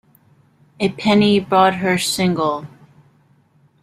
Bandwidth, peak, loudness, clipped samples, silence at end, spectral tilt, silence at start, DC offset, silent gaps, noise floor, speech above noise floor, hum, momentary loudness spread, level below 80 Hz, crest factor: 15.5 kHz; -2 dBFS; -17 LUFS; under 0.1%; 1.15 s; -5 dB/octave; 0.8 s; under 0.1%; none; -56 dBFS; 40 dB; none; 9 LU; -56 dBFS; 18 dB